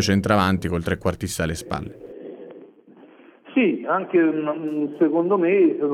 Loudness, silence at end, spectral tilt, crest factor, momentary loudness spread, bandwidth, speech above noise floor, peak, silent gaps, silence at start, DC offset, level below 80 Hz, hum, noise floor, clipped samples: -21 LUFS; 0 s; -6 dB/octave; 18 dB; 20 LU; 15.5 kHz; 28 dB; -4 dBFS; none; 0 s; under 0.1%; -46 dBFS; none; -49 dBFS; under 0.1%